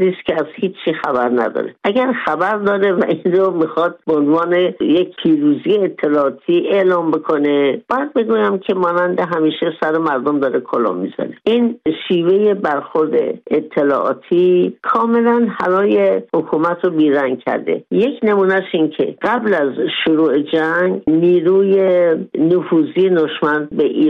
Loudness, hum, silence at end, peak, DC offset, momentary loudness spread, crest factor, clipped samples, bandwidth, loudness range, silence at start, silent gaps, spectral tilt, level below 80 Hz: -16 LUFS; none; 0 s; -4 dBFS; under 0.1%; 5 LU; 12 dB; under 0.1%; 5.4 kHz; 2 LU; 0 s; none; -8 dB/octave; -60 dBFS